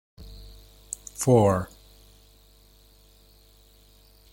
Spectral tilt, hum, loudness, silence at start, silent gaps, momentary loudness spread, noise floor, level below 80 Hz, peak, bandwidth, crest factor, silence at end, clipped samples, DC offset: -6.5 dB/octave; 50 Hz at -50 dBFS; -24 LUFS; 0.2 s; none; 28 LU; -56 dBFS; -52 dBFS; -6 dBFS; 17 kHz; 24 dB; 2.65 s; under 0.1%; under 0.1%